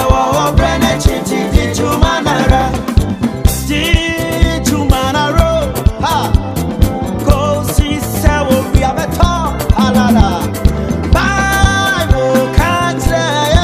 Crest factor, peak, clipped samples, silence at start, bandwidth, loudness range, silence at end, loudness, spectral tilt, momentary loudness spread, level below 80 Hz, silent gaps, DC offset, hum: 12 dB; 0 dBFS; 0.2%; 0 s; 16 kHz; 2 LU; 0 s; -13 LUFS; -5.5 dB/octave; 4 LU; -16 dBFS; none; 0.4%; none